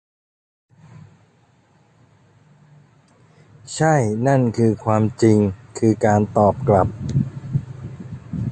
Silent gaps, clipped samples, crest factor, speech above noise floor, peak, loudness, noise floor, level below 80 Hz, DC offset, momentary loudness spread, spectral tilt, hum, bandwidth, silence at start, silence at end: none; under 0.1%; 18 dB; 40 dB; -2 dBFS; -19 LUFS; -57 dBFS; -44 dBFS; under 0.1%; 16 LU; -7.5 dB/octave; none; 9.2 kHz; 3.65 s; 0 s